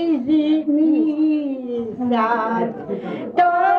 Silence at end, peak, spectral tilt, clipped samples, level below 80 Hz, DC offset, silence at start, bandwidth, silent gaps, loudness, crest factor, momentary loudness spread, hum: 0 s; -6 dBFS; -8 dB/octave; under 0.1%; -64 dBFS; under 0.1%; 0 s; 5 kHz; none; -19 LUFS; 12 dB; 9 LU; none